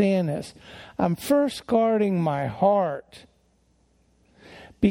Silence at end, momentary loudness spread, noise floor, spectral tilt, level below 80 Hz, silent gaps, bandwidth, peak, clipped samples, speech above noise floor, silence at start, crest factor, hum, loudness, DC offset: 0 s; 15 LU; -64 dBFS; -7 dB/octave; -54 dBFS; none; 16.5 kHz; -8 dBFS; under 0.1%; 40 dB; 0 s; 18 dB; none; -24 LUFS; under 0.1%